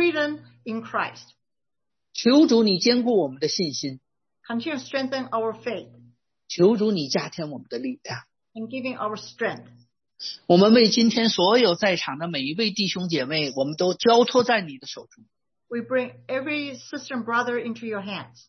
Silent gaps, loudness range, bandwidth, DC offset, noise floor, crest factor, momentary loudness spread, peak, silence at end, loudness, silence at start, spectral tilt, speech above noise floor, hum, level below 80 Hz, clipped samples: none; 9 LU; 6.4 kHz; under 0.1%; -88 dBFS; 20 dB; 16 LU; -4 dBFS; 0.2 s; -23 LUFS; 0 s; -4.5 dB/octave; 65 dB; none; -70 dBFS; under 0.1%